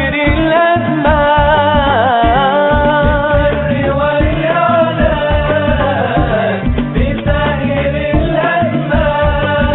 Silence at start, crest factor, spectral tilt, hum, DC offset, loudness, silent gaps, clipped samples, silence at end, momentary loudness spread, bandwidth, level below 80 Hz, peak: 0 s; 12 dB; -4.5 dB/octave; none; under 0.1%; -12 LUFS; none; under 0.1%; 0 s; 4 LU; 4.2 kHz; -22 dBFS; 0 dBFS